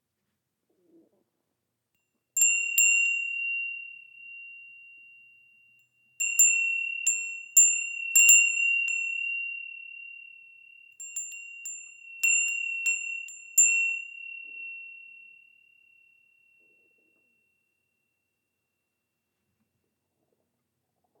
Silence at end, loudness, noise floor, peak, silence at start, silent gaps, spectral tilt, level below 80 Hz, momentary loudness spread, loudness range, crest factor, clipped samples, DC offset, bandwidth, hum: 6.15 s; -22 LUFS; -82 dBFS; -6 dBFS; 2.35 s; none; 7 dB/octave; under -90 dBFS; 24 LU; 13 LU; 24 dB; under 0.1%; under 0.1%; 18 kHz; none